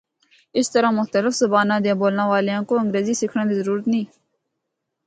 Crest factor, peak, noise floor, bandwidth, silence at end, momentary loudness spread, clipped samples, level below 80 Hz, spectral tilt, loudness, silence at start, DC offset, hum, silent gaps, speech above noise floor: 16 dB; -4 dBFS; -78 dBFS; 9.4 kHz; 1 s; 5 LU; under 0.1%; -70 dBFS; -5 dB/octave; -20 LUFS; 0.55 s; under 0.1%; none; none; 59 dB